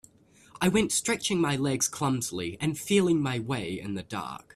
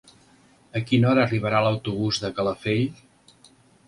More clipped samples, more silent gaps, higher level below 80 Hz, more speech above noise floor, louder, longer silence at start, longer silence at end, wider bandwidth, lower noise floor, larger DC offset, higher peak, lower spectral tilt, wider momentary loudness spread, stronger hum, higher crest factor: neither; neither; about the same, -58 dBFS vs -54 dBFS; about the same, 31 dB vs 34 dB; second, -28 LUFS vs -23 LUFS; second, 0.55 s vs 0.75 s; second, 0.15 s vs 0.95 s; first, 14.5 kHz vs 11.5 kHz; about the same, -58 dBFS vs -56 dBFS; neither; second, -10 dBFS vs -6 dBFS; second, -4 dB/octave vs -6.5 dB/octave; about the same, 11 LU vs 9 LU; neither; about the same, 18 dB vs 18 dB